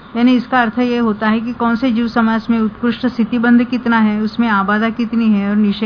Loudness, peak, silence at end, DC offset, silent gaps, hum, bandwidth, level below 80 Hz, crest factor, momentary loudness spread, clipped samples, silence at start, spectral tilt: -15 LUFS; -2 dBFS; 0 s; under 0.1%; none; none; 5.4 kHz; -46 dBFS; 12 dB; 5 LU; under 0.1%; 0 s; -8 dB/octave